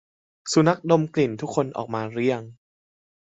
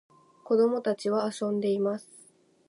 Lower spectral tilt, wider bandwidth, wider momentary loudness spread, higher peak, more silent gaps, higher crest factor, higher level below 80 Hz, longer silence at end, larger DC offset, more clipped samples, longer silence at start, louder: about the same, -6 dB/octave vs -6 dB/octave; second, 8.4 kHz vs 11.5 kHz; first, 9 LU vs 6 LU; first, -4 dBFS vs -14 dBFS; neither; about the same, 20 dB vs 16 dB; first, -64 dBFS vs -82 dBFS; first, 0.8 s vs 0.65 s; neither; neither; about the same, 0.45 s vs 0.45 s; first, -23 LUFS vs -28 LUFS